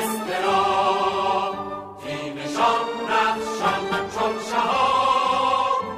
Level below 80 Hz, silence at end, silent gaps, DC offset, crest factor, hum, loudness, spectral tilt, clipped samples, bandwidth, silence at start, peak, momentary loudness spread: -56 dBFS; 0 s; none; under 0.1%; 16 dB; none; -22 LUFS; -3.5 dB/octave; under 0.1%; 15.5 kHz; 0 s; -8 dBFS; 10 LU